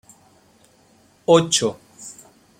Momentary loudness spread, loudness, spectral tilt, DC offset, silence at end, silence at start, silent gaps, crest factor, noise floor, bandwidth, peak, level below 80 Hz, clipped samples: 23 LU; -18 LUFS; -3.5 dB/octave; under 0.1%; 0.5 s; 1.3 s; none; 22 dB; -56 dBFS; 15.5 kHz; -2 dBFS; -62 dBFS; under 0.1%